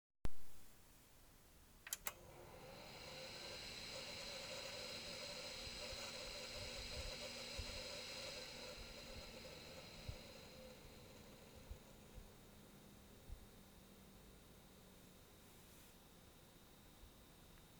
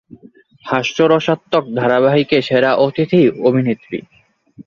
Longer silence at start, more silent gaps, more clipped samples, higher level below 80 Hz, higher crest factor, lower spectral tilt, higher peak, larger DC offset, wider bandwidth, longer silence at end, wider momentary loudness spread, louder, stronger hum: second, 0.15 s vs 0.65 s; neither; neither; second, -64 dBFS vs -58 dBFS; first, 28 dB vs 14 dB; second, -2.5 dB/octave vs -6.5 dB/octave; second, -22 dBFS vs -2 dBFS; neither; first, over 20 kHz vs 7.2 kHz; about the same, 0 s vs 0.05 s; first, 16 LU vs 9 LU; second, -52 LUFS vs -15 LUFS; neither